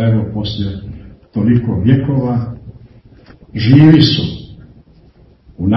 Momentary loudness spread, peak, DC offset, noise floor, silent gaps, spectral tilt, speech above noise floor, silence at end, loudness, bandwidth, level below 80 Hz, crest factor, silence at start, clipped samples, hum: 22 LU; 0 dBFS; under 0.1%; -45 dBFS; none; -8.5 dB/octave; 34 dB; 0 s; -13 LUFS; 6 kHz; -38 dBFS; 14 dB; 0 s; 0.3%; none